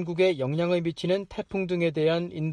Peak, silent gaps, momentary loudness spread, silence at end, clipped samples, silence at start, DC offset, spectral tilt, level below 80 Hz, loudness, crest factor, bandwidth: -12 dBFS; none; 5 LU; 0 s; under 0.1%; 0 s; under 0.1%; -7 dB/octave; -58 dBFS; -27 LUFS; 14 dB; 10 kHz